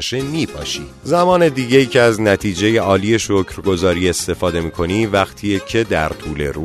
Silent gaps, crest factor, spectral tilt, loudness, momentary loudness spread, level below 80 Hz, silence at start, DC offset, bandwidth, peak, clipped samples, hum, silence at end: none; 16 dB; -5 dB/octave; -16 LUFS; 9 LU; -38 dBFS; 0 s; under 0.1%; 13.5 kHz; 0 dBFS; under 0.1%; none; 0 s